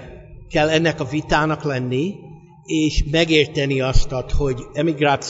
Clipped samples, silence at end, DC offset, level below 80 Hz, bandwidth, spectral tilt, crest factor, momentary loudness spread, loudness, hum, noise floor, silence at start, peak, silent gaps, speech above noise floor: under 0.1%; 0 s; under 0.1%; -28 dBFS; 8 kHz; -5.5 dB/octave; 18 dB; 8 LU; -20 LUFS; none; -38 dBFS; 0 s; -2 dBFS; none; 20 dB